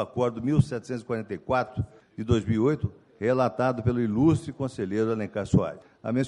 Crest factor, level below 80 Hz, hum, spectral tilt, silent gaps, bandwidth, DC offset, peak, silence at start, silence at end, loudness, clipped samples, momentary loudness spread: 18 dB; -48 dBFS; none; -8 dB/octave; none; 11 kHz; under 0.1%; -8 dBFS; 0 s; 0 s; -27 LUFS; under 0.1%; 10 LU